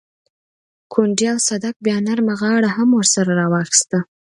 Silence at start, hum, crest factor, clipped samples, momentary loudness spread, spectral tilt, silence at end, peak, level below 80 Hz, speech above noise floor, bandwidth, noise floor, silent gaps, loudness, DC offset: 0.9 s; none; 18 dB; under 0.1%; 7 LU; -4 dB/octave; 0.3 s; 0 dBFS; -64 dBFS; over 73 dB; 11.5 kHz; under -90 dBFS; 1.76-1.80 s; -17 LUFS; under 0.1%